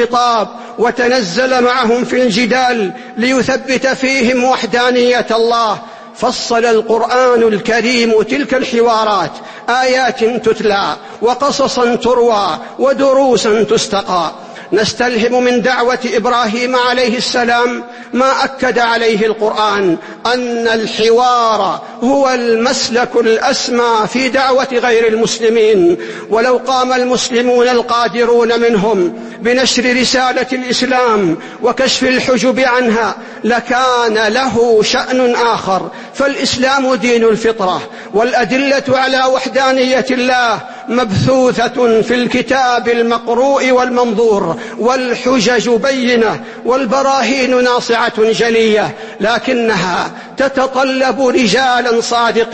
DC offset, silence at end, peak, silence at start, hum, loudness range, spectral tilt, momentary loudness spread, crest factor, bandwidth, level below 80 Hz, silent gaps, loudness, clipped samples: under 0.1%; 0 s; 0 dBFS; 0 s; none; 1 LU; -3.5 dB/octave; 6 LU; 12 dB; 8.8 kHz; -48 dBFS; none; -12 LUFS; under 0.1%